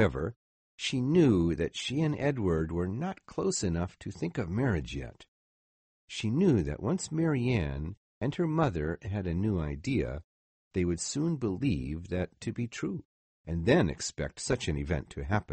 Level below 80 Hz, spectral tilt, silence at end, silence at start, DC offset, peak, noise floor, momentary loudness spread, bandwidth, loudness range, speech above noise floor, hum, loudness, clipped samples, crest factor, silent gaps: -46 dBFS; -6 dB/octave; 0 s; 0 s; under 0.1%; -12 dBFS; under -90 dBFS; 11 LU; 8.8 kHz; 4 LU; over 60 dB; none; -31 LUFS; under 0.1%; 20 dB; 0.36-0.78 s, 5.28-6.08 s, 7.97-8.21 s, 10.24-10.71 s, 13.05-13.44 s